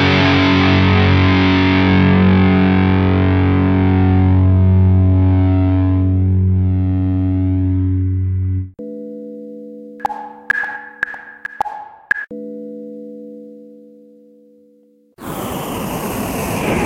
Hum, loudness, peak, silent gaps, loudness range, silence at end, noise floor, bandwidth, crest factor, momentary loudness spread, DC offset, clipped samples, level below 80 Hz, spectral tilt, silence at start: none; -15 LUFS; 0 dBFS; none; 15 LU; 0 s; -52 dBFS; 15.5 kHz; 14 dB; 19 LU; under 0.1%; under 0.1%; -38 dBFS; -7 dB/octave; 0 s